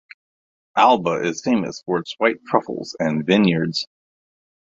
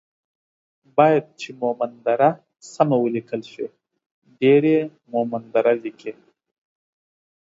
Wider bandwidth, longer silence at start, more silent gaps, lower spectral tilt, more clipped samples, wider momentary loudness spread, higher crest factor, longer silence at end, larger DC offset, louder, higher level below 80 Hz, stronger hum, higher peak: about the same, 7.8 kHz vs 8 kHz; second, 0.75 s vs 0.95 s; second, none vs 4.06-4.22 s; second, -5.5 dB/octave vs -7 dB/octave; neither; second, 10 LU vs 17 LU; about the same, 20 dB vs 22 dB; second, 0.85 s vs 1.35 s; neither; about the same, -20 LUFS vs -20 LUFS; first, -62 dBFS vs -74 dBFS; neither; about the same, -2 dBFS vs -2 dBFS